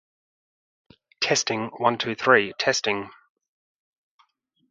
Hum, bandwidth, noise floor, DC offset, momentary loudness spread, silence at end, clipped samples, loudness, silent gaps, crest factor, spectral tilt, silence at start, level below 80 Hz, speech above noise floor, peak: none; 9.6 kHz; -66 dBFS; under 0.1%; 9 LU; 1.6 s; under 0.1%; -23 LUFS; none; 24 dB; -2.5 dB/octave; 1.2 s; -70 dBFS; 43 dB; -2 dBFS